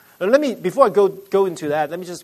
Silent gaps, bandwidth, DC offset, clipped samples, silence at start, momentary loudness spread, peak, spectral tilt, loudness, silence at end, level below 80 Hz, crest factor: none; 13.5 kHz; under 0.1%; under 0.1%; 0.2 s; 7 LU; 0 dBFS; -5.5 dB/octave; -18 LUFS; 0 s; -68 dBFS; 18 dB